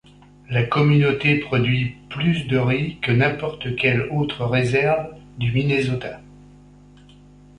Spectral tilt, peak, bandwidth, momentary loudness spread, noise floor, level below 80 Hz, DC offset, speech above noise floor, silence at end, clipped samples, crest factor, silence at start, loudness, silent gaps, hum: -7.5 dB/octave; -4 dBFS; 10 kHz; 10 LU; -47 dBFS; -48 dBFS; under 0.1%; 27 dB; 1.35 s; under 0.1%; 16 dB; 0.5 s; -20 LUFS; none; 50 Hz at -40 dBFS